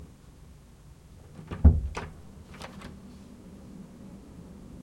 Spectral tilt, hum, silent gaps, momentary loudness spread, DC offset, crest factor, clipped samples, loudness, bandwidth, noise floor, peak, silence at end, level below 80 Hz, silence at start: -8 dB/octave; none; none; 29 LU; under 0.1%; 26 dB; under 0.1%; -27 LUFS; 9 kHz; -52 dBFS; -6 dBFS; 0.05 s; -34 dBFS; 0 s